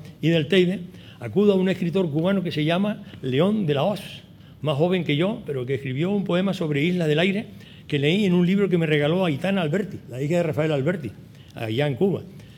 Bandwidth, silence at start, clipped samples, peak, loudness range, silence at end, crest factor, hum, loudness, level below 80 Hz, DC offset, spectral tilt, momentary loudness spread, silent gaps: 15 kHz; 0 s; under 0.1%; -6 dBFS; 3 LU; 0.05 s; 16 dB; none; -23 LUFS; -60 dBFS; under 0.1%; -7.5 dB/octave; 12 LU; none